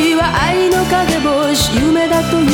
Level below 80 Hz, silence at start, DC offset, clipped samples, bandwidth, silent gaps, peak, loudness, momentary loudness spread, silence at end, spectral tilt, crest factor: -30 dBFS; 0 s; under 0.1%; under 0.1%; 20 kHz; none; -2 dBFS; -13 LUFS; 1 LU; 0 s; -4.5 dB/octave; 12 dB